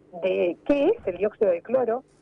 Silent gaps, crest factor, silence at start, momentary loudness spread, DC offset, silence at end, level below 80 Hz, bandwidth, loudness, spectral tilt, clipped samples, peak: none; 12 dB; 0.15 s; 5 LU; under 0.1%; 0.2 s; -56 dBFS; 6 kHz; -24 LUFS; -7.5 dB/octave; under 0.1%; -12 dBFS